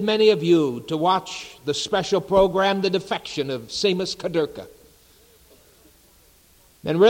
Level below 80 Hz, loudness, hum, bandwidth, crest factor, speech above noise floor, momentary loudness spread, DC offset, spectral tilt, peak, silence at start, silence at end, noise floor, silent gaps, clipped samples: -52 dBFS; -22 LUFS; none; 17 kHz; 18 dB; 34 dB; 11 LU; under 0.1%; -5 dB/octave; -4 dBFS; 0 s; 0 s; -55 dBFS; none; under 0.1%